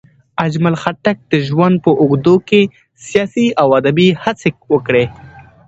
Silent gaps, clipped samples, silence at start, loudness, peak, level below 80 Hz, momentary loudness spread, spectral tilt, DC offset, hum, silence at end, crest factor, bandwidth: none; under 0.1%; 0.4 s; -14 LUFS; 0 dBFS; -50 dBFS; 8 LU; -7 dB/octave; under 0.1%; none; 0.25 s; 14 dB; 8.2 kHz